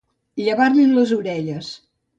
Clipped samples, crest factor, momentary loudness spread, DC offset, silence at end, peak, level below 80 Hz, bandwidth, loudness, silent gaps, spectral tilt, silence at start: under 0.1%; 14 dB; 19 LU; under 0.1%; 0.45 s; -4 dBFS; -64 dBFS; 8 kHz; -18 LUFS; none; -6.5 dB/octave; 0.35 s